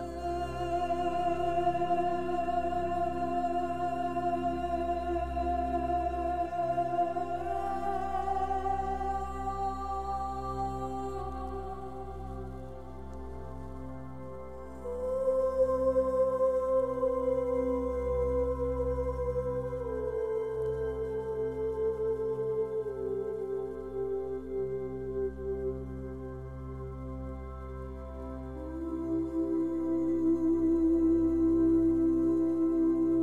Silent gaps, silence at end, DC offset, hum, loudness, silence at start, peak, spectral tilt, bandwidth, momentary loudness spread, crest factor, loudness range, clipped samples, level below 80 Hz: none; 0 s; 0.3%; none; -32 LUFS; 0 s; -18 dBFS; -8.5 dB/octave; 9.8 kHz; 15 LU; 14 dB; 10 LU; under 0.1%; -46 dBFS